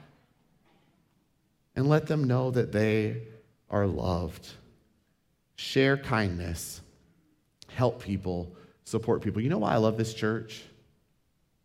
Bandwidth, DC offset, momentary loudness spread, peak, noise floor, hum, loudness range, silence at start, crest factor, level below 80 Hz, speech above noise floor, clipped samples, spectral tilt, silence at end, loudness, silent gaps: 16 kHz; under 0.1%; 17 LU; -10 dBFS; -72 dBFS; none; 3 LU; 1.75 s; 20 dB; -54 dBFS; 44 dB; under 0.1%; -6.5 dB/octave; 1 s; -29 LUFS; none